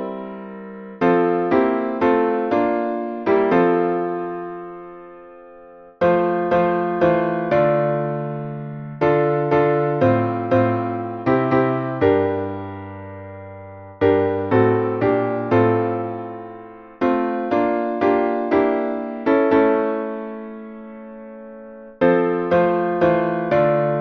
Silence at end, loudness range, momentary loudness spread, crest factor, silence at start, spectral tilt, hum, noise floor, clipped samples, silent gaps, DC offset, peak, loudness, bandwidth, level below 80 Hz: 0 s; 3 LU; 18 LU; 16 dB; 0 s; -9.5 dB/octave; none; -43 dBFS; under 0.1%; none; under 0.1%; -4 dBFS; -19 LUFS; 6.2 kHz; -56 dBFS